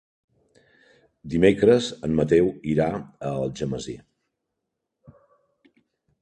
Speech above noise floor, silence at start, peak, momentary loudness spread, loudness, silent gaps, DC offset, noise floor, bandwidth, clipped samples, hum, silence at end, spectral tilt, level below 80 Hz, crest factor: 60 dB; 1.25 s; -2 dBFS; 14 LU; -23 LUFS; none; under 0.1%; -82 dBFS; 9.6 kHz; under 0.1%; none; 2.25 s; -6.5 dB/octave; -50 dBFS; 22 dB